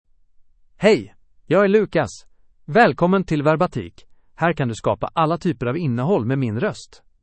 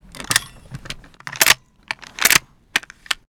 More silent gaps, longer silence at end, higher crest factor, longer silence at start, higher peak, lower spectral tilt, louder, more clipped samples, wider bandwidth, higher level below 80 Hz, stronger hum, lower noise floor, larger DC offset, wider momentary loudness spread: neither; first, 0.4 s vs 0.15 s; about the same, 20 dB vs 22 dB; first, 0.8 s vs 0.2 s; about the same, -2 dBFS vs 0 dBFS; first, -7 dB/octave vs 0 dB/octave; second, -20 LUFS vs -17 LUFS; neither; second, 8.8 kHz vs over 20 kHz; about the same, -50 dBFS vs -48 dBFS; neither; first, -52 dBFS vs -37 dBFS; neither; second, 8 LU vs 20 LU